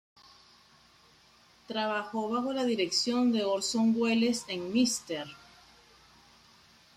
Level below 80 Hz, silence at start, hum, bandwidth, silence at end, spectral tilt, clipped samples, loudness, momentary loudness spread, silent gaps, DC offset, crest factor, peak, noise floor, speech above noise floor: -72 dBFS; 1.7 s; none; 13.5 kHz; 1.6 s; -3.5 dB/octave; under 0.1%; -29 LUFS; 8 LU; none; under 0.1%; 16 dB; -16 dBFS; -61 dBFS; 32 dB